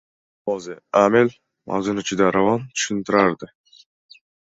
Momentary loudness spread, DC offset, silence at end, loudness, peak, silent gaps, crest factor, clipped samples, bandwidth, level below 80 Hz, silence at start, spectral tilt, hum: 12 LU; under 0.1%; 1.05 s; -20 LUFS; -2 dBFS; none; 20 dB; under 0.1%; 8 kHz; -58 dBFS; 0.45 s; -4.5 dB/octave; none